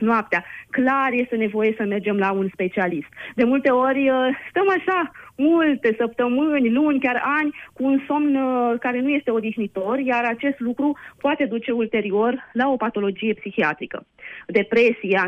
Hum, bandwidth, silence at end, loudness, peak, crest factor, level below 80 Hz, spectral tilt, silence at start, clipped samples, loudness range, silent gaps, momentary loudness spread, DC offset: none; 6.4 kHz; 0 s; -21 LUFS; -6 dBFS; 16 dB; -64 dBFS; -7.5 dB/octave; 0 s; under 0.1%; 3 LU; none; 7 LU; under 0.1%